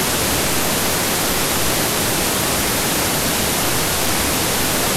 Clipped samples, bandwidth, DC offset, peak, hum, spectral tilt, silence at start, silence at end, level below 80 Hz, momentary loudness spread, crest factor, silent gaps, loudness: under 0.1%; 16 kHz; under 0.1%; -4 dBFS; none; -2.5 dB/octave; 0 s; 0 s; -36 dBFS; 0 LU; 14 dB; none; -17 LUFS